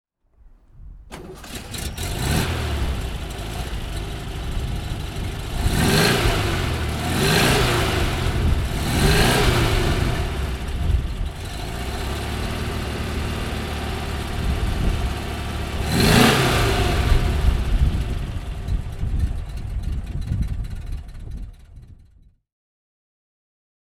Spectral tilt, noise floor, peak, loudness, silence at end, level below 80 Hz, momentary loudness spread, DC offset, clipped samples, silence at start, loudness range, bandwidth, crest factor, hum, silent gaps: -4.5 dB/octave; -53 dBFS; -2 dBFS; -23 LUFS; 1.8 s; -26 dBFS; 14 LU; under 0.1%; under 0.1%; 0.45 s; 10 LU; 17 kHz; 20 dB; none; none